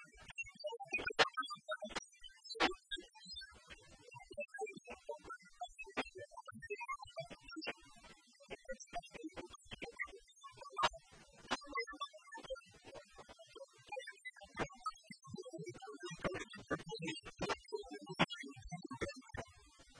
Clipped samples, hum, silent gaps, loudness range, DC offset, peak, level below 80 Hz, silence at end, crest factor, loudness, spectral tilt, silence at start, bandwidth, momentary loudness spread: under 0.1%; none; none; 9 LU; under 0.1%; -16 dBFS; -66 dBFS; 0 s; 30 dB; -45 LUFS; -3.5 dB/octave; 0 s; 10.5 kHz; 19 LU